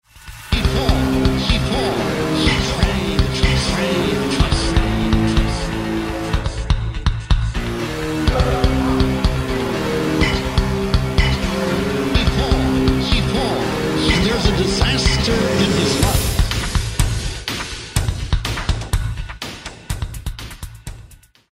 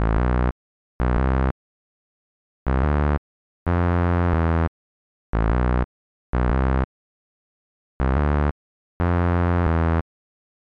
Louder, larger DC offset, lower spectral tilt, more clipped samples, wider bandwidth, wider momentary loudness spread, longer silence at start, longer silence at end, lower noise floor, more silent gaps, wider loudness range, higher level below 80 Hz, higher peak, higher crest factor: first, -19 LUFS vs -23 LUFS; second, under 0.1% vs 0.2%; second, -5 dB/octave vs -10 dB/octave; neither; first, 16 kHz vs 5 kHz; about the same, 9 LU vs 8 LU; first, 0.15 s vs 0 s; second, 0.35 s vs 0.65 s; second, -45 dBFS vs under -90 dBFS; second, none vs 0.52-0.99 s, 1.51-2.66 s, 3.18-3.66 s, 4.68-5.33 s, 5.84-6.33 s, 6.84-8.00 s, 8.51-9.00 s; first, 6 LU vs 3 LU; about the same, -22 dBFS vs -26 dBFS; first, -2 dBFS vs -8 dBFS; about the same, 16 dB vs 14 dB